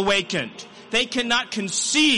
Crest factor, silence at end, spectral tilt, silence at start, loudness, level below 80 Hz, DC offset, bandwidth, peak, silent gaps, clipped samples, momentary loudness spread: 14 dB; 0 s; -2 dB/octave; 0 s; -22 LUFS; -54 dBFS; under 0.1%; 11.5 kHz; -8 dBFS; none; under 0.1%; 9 LU